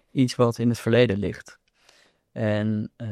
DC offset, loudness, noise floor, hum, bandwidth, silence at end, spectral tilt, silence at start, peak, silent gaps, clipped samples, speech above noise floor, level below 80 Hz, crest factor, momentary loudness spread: under 0.1%; -23 LUFS; -60 dBFS; none; 14 kHz; 0 s; -7 dB/octave; 0.15 s; -8 dBFS; none; under 0.1%; 37 dB; -60 dBFS; 18 dB; 11 LU